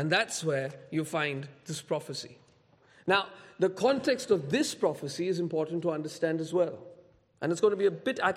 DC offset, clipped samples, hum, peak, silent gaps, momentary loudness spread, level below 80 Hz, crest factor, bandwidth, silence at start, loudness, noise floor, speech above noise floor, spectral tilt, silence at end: under 0.1%; under 0.1%; none; -12 dBFS; none; 12 LU; -74 dBFS; 18 dB; 15.5 kHz; 0 s; -30 LUFS; -63 dBFS; 33 dB; -4.5 dB/octave; 0 s